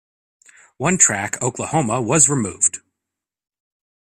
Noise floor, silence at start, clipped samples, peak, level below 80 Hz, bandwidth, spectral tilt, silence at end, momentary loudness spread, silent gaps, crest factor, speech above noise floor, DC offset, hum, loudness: -85 dBFS; 0.8 s; under 0.1%; 0 dBFS; -56 dBFS; 15.5 kHz; -3.5 dB/octave; 1.3 s; 9 LU; none; 22 dB; 66 dB; under 0.1%; none; -17 LUFS